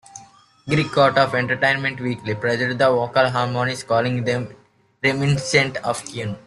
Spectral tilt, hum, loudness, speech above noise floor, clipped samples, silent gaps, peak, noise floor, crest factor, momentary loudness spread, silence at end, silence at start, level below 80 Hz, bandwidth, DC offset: -5 dB/octave; none; -20 LUFS; 29 dB; under 0.1%; none; -2 dBFS; -49 dBFS; 18 dB; 9 LU; 0.05 s; 0.15 s; -54 dBFS; 12 kHz; under 0.1%